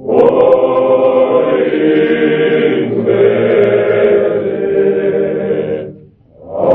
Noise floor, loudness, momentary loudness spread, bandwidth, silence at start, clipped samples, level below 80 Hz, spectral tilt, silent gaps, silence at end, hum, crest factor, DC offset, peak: -39 dBFS; -11 LUFS; 7 LU; 4 kHz; 0 s; 0.1%; -52 dBFS; -9.5 dB/octave; none; 0 s; none; 12 dB; under 0.1%; 0 dBFS